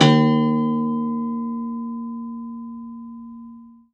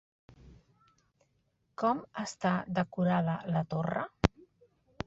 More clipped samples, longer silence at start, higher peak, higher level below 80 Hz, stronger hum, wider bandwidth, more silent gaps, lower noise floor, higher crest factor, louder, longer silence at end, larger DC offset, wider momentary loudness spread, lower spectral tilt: neither; second, 0 s vs 0.45 s; about the same, -2 dBFS vs -4 dBFS; second, -66 dBFS vs -50 dBFS; neither; about the same, 8.4 kHz vs 8 kHz; neither; second, -43 dBFS vs -75 dBFS; second, 20 dB vs 30 dB; first, -22 LUFS vs -32 LUFS; second, 0.2 s vs 0.6 s; neither; first, 20 LU vs 6 LU; about the same, -6.5 dB/octave vs -6.5 dB/octave